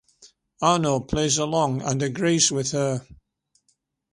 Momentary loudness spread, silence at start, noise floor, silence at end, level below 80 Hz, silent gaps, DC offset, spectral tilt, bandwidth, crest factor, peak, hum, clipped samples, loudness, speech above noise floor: 6 LU; 0.6 s; -70 dBFS; 1 s; -50 dBFS; none; under 0.1%; -4 dB/octave; 11.5 kHz; 20 dB; -4 dBFS; none; under 0.1%; -22 LUFS; 48 dB